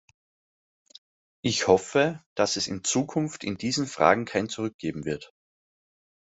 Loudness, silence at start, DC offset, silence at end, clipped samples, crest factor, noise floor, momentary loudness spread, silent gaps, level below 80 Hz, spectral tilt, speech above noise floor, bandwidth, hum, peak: -26 LUFS; 1.45 s; under 0.1%; 1.1 s; under 0.1%; 26 dB; under -90 dBFS; 10 LU; 2.26-2.36 s, 4.74-4.79 s; -64 dBFS; -4 dB/octave; over 64 dB; 8.2 kHz; none; -2 dBFS